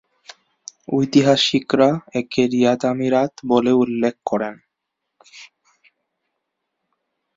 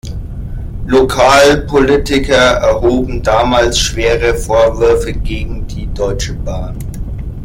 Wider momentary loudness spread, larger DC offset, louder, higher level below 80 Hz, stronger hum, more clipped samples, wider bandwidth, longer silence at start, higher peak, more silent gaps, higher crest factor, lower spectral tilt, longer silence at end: second, 9 LU vs 16 LU; neither; second, -18 LUFS vs -12 LUFS; second, -62 dBFS vs -22 dBFS; neither; neither; second, 7.8 kHz vs 16.5 kHz; first, 0.9 s vs 0.05 s; about the same, -2 dBFS vs 0 dBFS; neither; first, 18 dB vs 12 dB; about the same, -5.5 dB/octave vs -4.5 dB/octave; first, 1.9 s vs 0 s